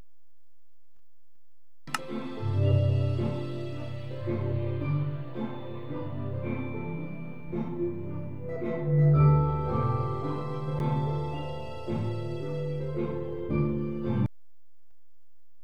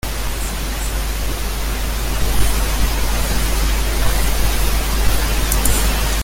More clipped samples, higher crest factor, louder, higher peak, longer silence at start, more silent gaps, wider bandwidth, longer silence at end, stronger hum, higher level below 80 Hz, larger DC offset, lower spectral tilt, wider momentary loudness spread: neither; about the same, 20 dB vs 16 dB; second, -30 LUFS vs -20 LUFS; second, -12 dBFS vs -2 dBFS; first, 1.85 s vs 0.05 s; neither; second, 11.5 kHz vs 17 kHz; first, 1.35 s vs 0 s; neither; second, -48 dBFS vs -18 dBFS; first, 1% vs under 0.1%; first, -8.5 dB/octave vs -3.5 dB/octave; first, 12 LU vs 6 LU